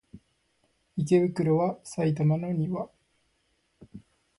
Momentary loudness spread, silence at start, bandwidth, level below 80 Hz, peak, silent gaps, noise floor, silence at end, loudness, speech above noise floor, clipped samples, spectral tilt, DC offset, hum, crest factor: 11 LU; 0.15 s; 11.5 kHz; -64 dBFS; -10 dBFS; none; -72 dBFS; 0.4 s; -27 LUFS; 47 dB; under 0.1%; -8 dB/octave; under 0.1%; none; 18 dB